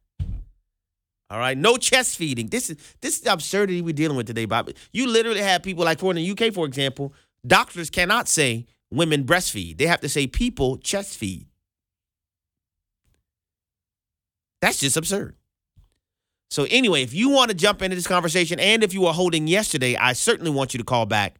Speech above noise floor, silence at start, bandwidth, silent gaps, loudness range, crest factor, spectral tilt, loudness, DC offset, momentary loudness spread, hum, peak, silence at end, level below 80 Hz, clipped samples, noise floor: 68 dB; 0.2 s; 19 kHz; none; 8 LU; 20 dB; -3.5 dB/octave; -21 LUFS; under 0.1%; 13 LU; none; -2 dBFS; 0.1 s; -44 dBFS; under 0.1%; -89 dBFS